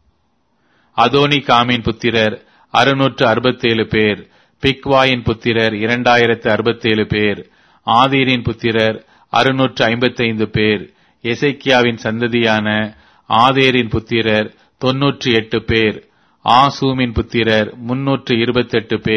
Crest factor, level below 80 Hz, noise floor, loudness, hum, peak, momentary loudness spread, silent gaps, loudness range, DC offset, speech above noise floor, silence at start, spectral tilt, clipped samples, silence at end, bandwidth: 16 dB; -42 dBFS; -63 dBFS; -15 LUFS; none; 0 dBFS; 7 LU; none; 1 LU; under 0.1%; 48 dB; 0.95 s; -6 dB/octave; under 0.1%; 0 s; 11 kHz